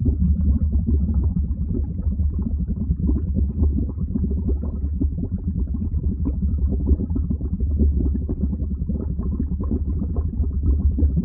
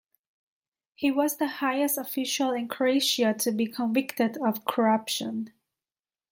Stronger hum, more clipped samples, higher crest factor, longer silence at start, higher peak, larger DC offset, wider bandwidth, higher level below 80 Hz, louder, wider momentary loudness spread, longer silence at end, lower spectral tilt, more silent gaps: neither; neither; about the same, 14 dB vs 18 dB; second, 0 s vs 1 s; about the same, -8 dBFS vs -10 dBFS; neither; second, 1.4 kHz vs 17 kHz; first, -22 dBFS vs -76 dBFS; first, -23 LUFS vs -27 LUFS; about the same, 5 LU vs 6 LU; second, 0 s vs 0.85 s; first, -17 dB/octave vs -3 dB/octave; neither